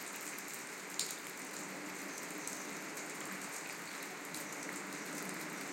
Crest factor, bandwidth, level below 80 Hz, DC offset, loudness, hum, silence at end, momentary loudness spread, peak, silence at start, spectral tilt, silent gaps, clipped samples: 28 dB; 17 kHz; under -90 dBFS; under 0.1%; -43 LUFS; none; 0 s; 3 LU; -16 dBFS; 0 s; -1.5 dB/octave; none; under 0.1%